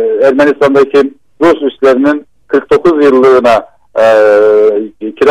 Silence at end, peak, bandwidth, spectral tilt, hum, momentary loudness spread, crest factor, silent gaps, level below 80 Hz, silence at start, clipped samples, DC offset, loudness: 0 s; 0 dBFS; 10 kHz; -6 dB/octave; none; 9 LU; 8 dB; none; -46 dBFS; 0 s; under 0.1%; 0.3%; -8 LUFS